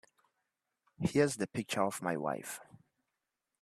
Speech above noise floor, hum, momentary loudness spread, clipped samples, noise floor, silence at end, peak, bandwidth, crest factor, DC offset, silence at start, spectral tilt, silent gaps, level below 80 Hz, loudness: 54 dB; none; 11 LU; under 0.1%; -88 dBFS; 1 s; -16 dBFS; 14 kHz; 22 dB; under 0.1%; 1 s; -5 dB/octave; none; -70 dBFS; -35 LUFS